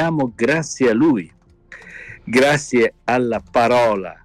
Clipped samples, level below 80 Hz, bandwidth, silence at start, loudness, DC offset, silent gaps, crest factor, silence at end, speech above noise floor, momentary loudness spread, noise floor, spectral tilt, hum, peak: under 0.1%; -50 dBFS; 15 kHz; 0 s; -17 LUFS; under 0.1%; none; 12 dB; 0.1 s; 26 dB; 20 LU; -43 dBFS; -5 dB/octave; none; -6 dBFS